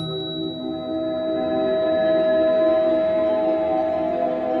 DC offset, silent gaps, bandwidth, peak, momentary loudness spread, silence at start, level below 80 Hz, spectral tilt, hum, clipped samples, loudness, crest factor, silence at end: under 0.1%; none; 4.9 kHz; -10 dBFS; 9 LU; 0 s; -54 dBFS; -8 dB/octave; none; under 0.1%; -21 LUFS; 12 dB; 0 s